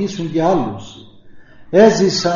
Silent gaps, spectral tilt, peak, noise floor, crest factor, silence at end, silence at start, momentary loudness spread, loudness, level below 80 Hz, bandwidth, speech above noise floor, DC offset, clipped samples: none; -4.5 dB/octave; 0 dBFS; -39 dBFS; 16 dB; 0 s; 0 s; 13 LU; -14 LUFS; -48 dBFS; 7.4 kHz; 24 dB; under 0.1%; under 0.1%